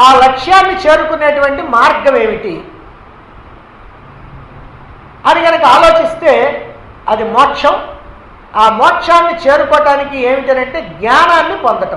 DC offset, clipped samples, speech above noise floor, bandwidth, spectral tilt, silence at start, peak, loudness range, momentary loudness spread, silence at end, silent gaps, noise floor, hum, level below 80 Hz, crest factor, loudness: under 0.1%; 0.6%; 26 dB; 11.5 kHz; -3.5 dB/octave; 0 s; 0 dBFS; 6 LU; 12 LU; 0 s; none; -35 dBFS; none; -38 dBFS; 10 dB; -9 LUFS